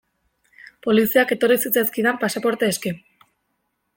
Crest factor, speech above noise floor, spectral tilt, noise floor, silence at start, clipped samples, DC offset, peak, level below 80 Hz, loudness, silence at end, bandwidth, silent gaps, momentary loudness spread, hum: 20 dB; 53 dB; -4 dB/octave; -73 dBFS; 0.85 s; under 0.1%; under 0.1%; -2 dBFS; -64 dBFS; -20 LUFS; 1 s; 17 kHz; none; 11 LU; none